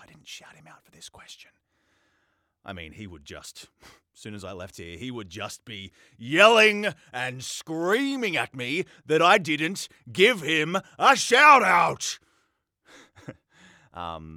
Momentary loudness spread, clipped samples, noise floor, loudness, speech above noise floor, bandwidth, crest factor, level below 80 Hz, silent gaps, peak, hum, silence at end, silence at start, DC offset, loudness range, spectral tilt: 26 LU; under 0.1%; -72 dBFS; -21 LUFS; 48 dB; 17.5 kHz; 24 dB; -66 dBFS; none; -2 dBFS; none; 0 s; 0.3 s; under 0.1%; 20 LU; -3 dB/octave